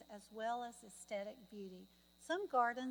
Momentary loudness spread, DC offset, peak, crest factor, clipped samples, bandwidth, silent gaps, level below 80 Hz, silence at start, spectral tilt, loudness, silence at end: 18 LU; under 0.1%; -24 dBFS; 20 dB; under 0.1%; 19.5 kHz; none; -80 dBFS; 0 s; -3.5 dB/octave; -43 LUFS; 0 s